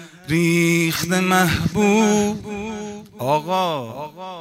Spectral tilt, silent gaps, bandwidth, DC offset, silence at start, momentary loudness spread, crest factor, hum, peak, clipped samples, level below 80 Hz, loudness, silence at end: -5 dB/octave; none; 16 kHz; under 0.1%; 0 s; 15 LU; 14 dB; none; -4 dBFS; under 0.1%; -48 dBFS; -19 LUFS; 0 s